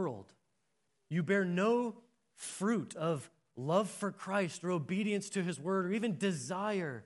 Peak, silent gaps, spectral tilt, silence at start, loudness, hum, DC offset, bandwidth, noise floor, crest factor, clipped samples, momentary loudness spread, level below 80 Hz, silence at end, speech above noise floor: -16 dBFS; none; -5.5 dB/octave; 0 s; -35 LUFS; none; under 0.1%; 11.5 kHz; -81 dBFS; 18 dB; under 0.1%; 9 LU; -84 dBFS; 0.05 s; 47 dB